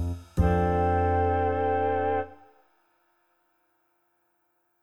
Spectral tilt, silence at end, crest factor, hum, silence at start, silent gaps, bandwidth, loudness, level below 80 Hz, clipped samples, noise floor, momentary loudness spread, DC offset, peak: -9 dB/octave; 2.5 s; 16 dB; none; 0 s; none; 8 kHz; -26 LUFS; -40 dBFS; under 0.1%; -73 dBFS; 7 LU; under 0.1%; -12 dBFS